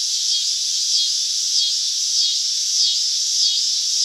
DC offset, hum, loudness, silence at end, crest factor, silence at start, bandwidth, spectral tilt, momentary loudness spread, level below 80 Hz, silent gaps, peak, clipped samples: under 0.1%; none; -16 LUFS; 0 s; 16 dB; 0 s; 16 kHz; 13 dB/octave; 2 LU; under -90 dBFS; none; -4 dBFS; under 0.1%